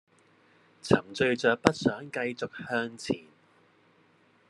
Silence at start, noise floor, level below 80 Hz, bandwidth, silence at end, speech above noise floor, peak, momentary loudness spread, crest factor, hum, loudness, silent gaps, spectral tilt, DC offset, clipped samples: 0.85 s; -64 dBFS; -64 dBFS; 12 kHz; 1.3 s; 35 dB; 0 dBFS; 10 LU; 30 dB; none; -29 LUFS; none; -5 dB/octave; under 0.1%; under 0.1%